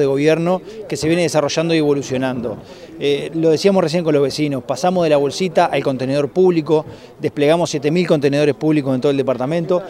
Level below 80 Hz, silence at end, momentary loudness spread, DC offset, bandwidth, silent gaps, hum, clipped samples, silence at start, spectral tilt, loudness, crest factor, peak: -54 dBFS; 0 s; 8 LU; under 0.1%; 14.5 kHz; none; none; under 0.1%; 0 s; -6 dB/octave; -17 LUFS; 16 dB; 0 dBFS